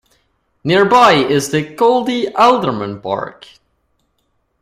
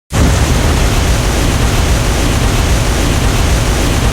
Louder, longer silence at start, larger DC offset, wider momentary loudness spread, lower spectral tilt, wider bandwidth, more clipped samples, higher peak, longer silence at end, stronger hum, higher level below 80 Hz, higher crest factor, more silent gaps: about the same, -13 LUFS vs -13 LUFS; first, 0.65 s vs 0.1 s; neither; first, 14 LU vs 1 LU; about the same, -5 dB/octave vs -4.5 dB/octave; second, 15.5 kHz vs 19 kHz; neither; about the same, 0 dBFS vs 0 dBFS; first, 1.3 s vs 0 s; neither; second, -54 dBFS vs -14 dBFS; first, 16 dB vs 10 dB; neither